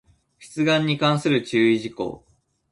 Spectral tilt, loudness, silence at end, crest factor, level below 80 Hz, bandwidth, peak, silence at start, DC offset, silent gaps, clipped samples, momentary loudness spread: -6 dB/octave; -21 LUFS; 0.55 s; 16 dB; -60 dBFS; 11.5 kHz; -6 dBFS; 0.4 s; under 0.1%; none; under 0.1%; 12 LU